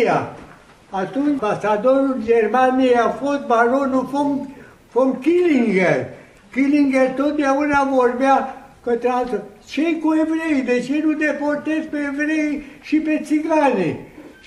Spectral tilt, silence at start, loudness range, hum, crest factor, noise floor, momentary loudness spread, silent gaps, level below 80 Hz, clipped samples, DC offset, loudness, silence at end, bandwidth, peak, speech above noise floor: -6 dB/octave; 0 s; 3 LU; none; 18 dB; -44 dBFS; 9 LU; none; -54 dBFS; under 0.1%; under 0.1%; -19 LUFS; 0.15 s; 11.5 kHz; 0 dBFS; 26 dB